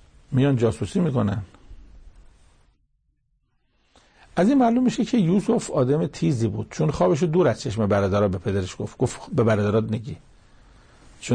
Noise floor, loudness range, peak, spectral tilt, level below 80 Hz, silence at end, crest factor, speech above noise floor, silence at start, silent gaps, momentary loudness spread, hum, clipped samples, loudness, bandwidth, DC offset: -68 dBFS; 8 LU; -8 dBFS; -7 dB/octave; -50 dBFS; 0 s; 14 dB; 47 dB; 0.3 s; none; 10 LU; none; under 0.1%; -22 LUFS; 9.8 kHz; under 0.1%